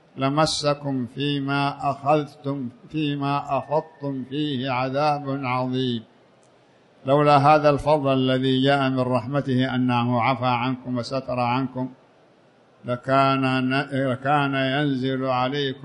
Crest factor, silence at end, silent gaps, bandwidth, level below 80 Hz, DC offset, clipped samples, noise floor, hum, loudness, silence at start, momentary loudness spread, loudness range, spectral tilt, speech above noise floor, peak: 18 dB; 0 s; none; 11 kHz; -56 dBFS; under 0.1%; under 0.1%; -56 dBFS; none; -23 LUFS; 0.15 s; 10 LU; 6 LU; -6.5 dB/octave; 34 dB; -4 dBFS